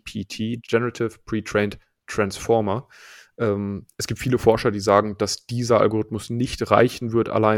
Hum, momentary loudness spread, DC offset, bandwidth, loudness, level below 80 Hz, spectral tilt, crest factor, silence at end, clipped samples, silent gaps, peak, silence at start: none; 11 LU; under 0.1%; 17.5 kHz; -22 LUFS; -48 dBFS; -5.5 dB/octave; 22 dB; 0 s; under 0.1%; none; 0 dBFS; 0.05 s